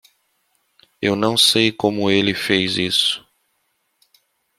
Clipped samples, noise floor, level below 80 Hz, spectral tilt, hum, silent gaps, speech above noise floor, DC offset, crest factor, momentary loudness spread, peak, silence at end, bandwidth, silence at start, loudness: under 0.1%; -69 dBFS; -58 dBFS; -3.5 dB/octave; none; none; 51 dB; under 0.1%; 20 dB; 8 LU; -2 dBFS; 1.4 s; 16 kHz; 1 s; -17 LUFS